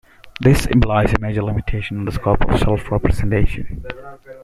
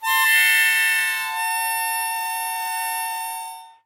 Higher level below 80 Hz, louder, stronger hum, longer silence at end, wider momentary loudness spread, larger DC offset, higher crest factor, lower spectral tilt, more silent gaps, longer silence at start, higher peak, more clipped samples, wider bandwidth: first, -24 dBFS vs -90 dBFS; about the same, -18 LUFS vs -19 LUFS; neither; second, 0 s vs 0.15 s; first, 16 LU vs 13 LU; neither; about the same, 16 dB vs 16 dB; first, -7 dB/octave vs 4.5 dB/octave; neither; first, 0.25 s vs 0 s; first, 0 dBFS vs -6 dBFS; neither; second, 14 kHz vs 16 kHz